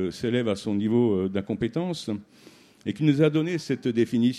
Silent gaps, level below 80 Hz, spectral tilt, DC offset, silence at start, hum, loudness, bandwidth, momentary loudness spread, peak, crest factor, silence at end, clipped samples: none; -60 dBFS; -7 dB/octave; under 0.1%; 0 s; none; -25 LUFS; 12.5 kHz; 11 LU; -8 dBFS; 18 dB; 0 s; under 0.1%